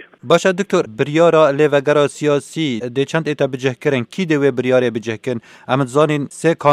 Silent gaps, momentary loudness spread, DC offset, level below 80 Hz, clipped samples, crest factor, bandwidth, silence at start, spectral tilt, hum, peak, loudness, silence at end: none; 8 LU; under 0.1%; -64 dBFS; under 0.1%; 16 dB; 13 kHz; 0.25 s; -6 dB/octave; none; 0 dBFS; -16 LUFS; 0 s